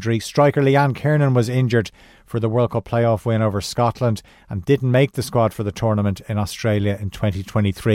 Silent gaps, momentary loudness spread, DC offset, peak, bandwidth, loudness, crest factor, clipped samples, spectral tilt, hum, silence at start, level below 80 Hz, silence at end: none; 8 LU; under 0.1%; -4 dBFS; 15.5 kHz; -20 LUFS; 14 dB; under 0.1%; -7 dB/octave; none; 0 s; -46 dBFS; 0 s